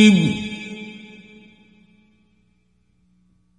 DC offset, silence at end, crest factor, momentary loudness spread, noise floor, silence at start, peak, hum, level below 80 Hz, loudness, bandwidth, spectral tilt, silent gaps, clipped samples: under 0.1%; 2.6 s; 22 dB; 28 LU; -64 dBFS; 0 s; 0 dBFS; 60 Hz at -65 dBFS; -56 dBFS; -21 LUFS; 10.5 kHz; -5.5 dB/octave; none; under 0.1%